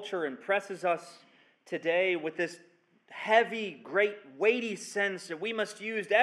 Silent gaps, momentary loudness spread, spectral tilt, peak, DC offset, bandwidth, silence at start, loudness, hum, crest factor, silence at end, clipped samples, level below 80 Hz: none; 10 LU; -3.5 dB/octave; -10 dBFS; under 0.1%; 12.5 kHz; 0 s; -31 LUFS; none; 22 dB; 0 s; under 0.1%; under -90 dBFS